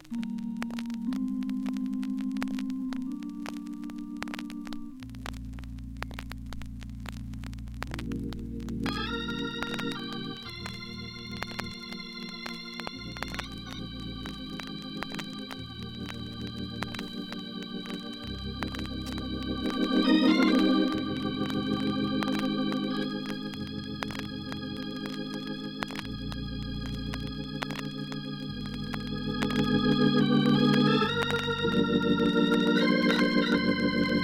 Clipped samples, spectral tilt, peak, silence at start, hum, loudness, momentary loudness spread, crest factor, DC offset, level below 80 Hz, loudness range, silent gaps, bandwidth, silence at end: under 0.1%; -6 dB/octave; -10 dBFS; 0 s; none; -31 LUFS; 15 LU; 20 dB; under 0.1%; -48 dBFS; 13 LU; none; 16 kHz; 0 s